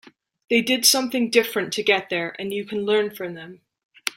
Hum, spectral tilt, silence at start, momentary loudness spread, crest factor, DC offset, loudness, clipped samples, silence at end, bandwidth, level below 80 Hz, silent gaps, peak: none; -2 dB/octave; 0.5 s; 14 LU; 22 dB; under 0.1%; -21 LUFS; under 0.1%; 0.05 s; 16.5 kHz; -68 dBFS; 3.84-3.89 s; -2 dBFS